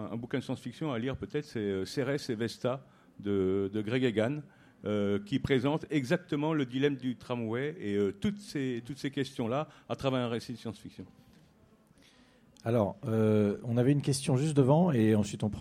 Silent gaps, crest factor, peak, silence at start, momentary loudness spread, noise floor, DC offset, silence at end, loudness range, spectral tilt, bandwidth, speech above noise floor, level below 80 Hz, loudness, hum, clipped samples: none; 20 dB; -12 dBFS; 0 s; 10 LU; -63 dBFS; under 0.1%; 0 s; 8 LU; -6.5 dB/octave; 15 kHz; 32 dB; -64 dBFS; -31 LUFS; none; under 0.1%